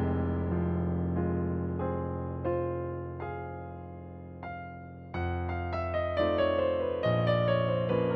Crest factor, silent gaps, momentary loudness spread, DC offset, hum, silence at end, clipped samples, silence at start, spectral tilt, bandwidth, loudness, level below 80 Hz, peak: 14 dB; none; 15 LU; under 0.1%; none; 0 s; under 0.1%; 0 s; -10 dB/octave; 5.4 kHz; -31 LUFS; -48 dBFS; -16 dBFS